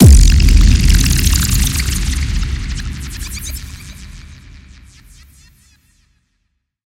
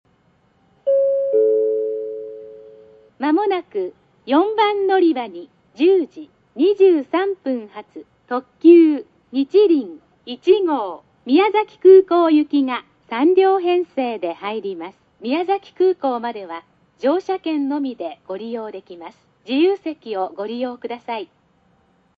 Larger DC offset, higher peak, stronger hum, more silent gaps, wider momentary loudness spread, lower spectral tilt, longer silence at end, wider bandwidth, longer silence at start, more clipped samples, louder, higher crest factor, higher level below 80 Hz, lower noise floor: neither; about the same, 0 dBFS vs -2 dBFS; neither; neither; first, 22 LU vs 18 LU; second, -4.5 dB/octave vs -6.5 dB/octave; first, 2.5 s vs 0.95 s; first, 17 kHz vs 5 kHz; second, 0 s vs 0.85 s; first, 0.6% vs under 0.1%; first, -14 LUFS vs -18 LUFS; about the same, 14 dB vs 18 dB; first, -14 dBFS vs -72 dBFS; first, -68 dBFS vs -59 dBFS